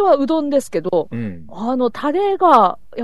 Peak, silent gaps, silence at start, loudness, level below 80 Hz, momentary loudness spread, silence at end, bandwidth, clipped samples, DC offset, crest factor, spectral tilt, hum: 0 dBFS; none; 0 s; -17 LUFS; -54 dBFS; 14 LU; 0 s; 12.5 kHz; under 0.1%; 2%; 16 dB; -6.5 dB/octave; none